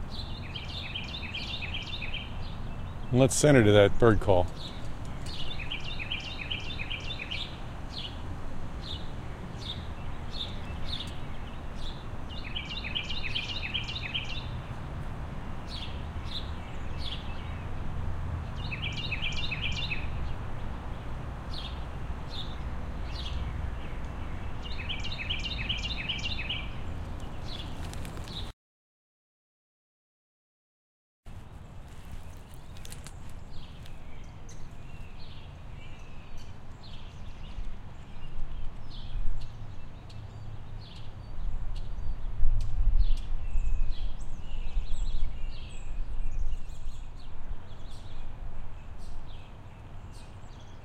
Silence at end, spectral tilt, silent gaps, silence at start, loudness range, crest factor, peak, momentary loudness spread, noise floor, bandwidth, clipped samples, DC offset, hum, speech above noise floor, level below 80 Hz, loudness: 0 s; -5 dB/octave; 28.53-31.23 s; 0 s; 20 LU; 24 dB; -6 dBFS; 15 LU; under -90 dBFS; 11 kHz; under 0.1%; under 0.1%; none; over 69 dB; -36 dBFS; -34 LUFS